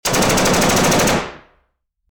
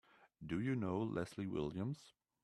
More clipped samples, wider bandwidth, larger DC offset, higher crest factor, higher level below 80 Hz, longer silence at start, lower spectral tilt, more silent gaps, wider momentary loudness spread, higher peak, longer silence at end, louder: neither; first, over 20 kHz vs 12.5 kHz; neither; about the same, 14 dB vs 16 dB; first, -36 dBFS vs -68 dBFS; second, 0.05 s vs 0.2 s; second, -3.5 dB/octave vs -7.5 dB/octave; neither; about the same, 7 LU vs 8 LU; first, -4 dBFS vs -26 dBFS; first, 0.75 s vs 0.35 s; first, -14 LUFS vs -42 LUFS